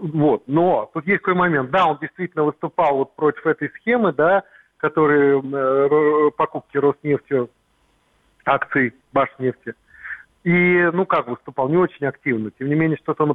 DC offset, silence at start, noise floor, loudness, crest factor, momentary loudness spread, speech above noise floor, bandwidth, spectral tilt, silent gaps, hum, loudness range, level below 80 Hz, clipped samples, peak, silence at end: under 0.1%; 0 s; -62 dBFS; -19 LUFS; 18 dB; 9 LU; 43 dB; 4.1 kHz; -9.5 dB/octave; none; none; 4 LU; -60 dBFS; under 0.1%; -2 dBFS; 0 s